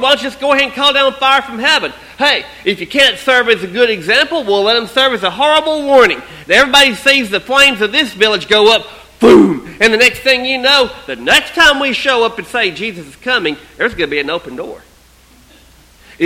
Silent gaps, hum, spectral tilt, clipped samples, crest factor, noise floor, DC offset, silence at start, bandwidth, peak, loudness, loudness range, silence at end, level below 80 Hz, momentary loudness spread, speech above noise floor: none; none; -2.5 dB/octave; 0.4%; 12 dB; -45 dBFS; under 0.1%; 0 s; 17 kHz; 0 dBFS; -11 LUFS; 7 LU; 0 s; -44 dBFS; 10 LU; 33 dB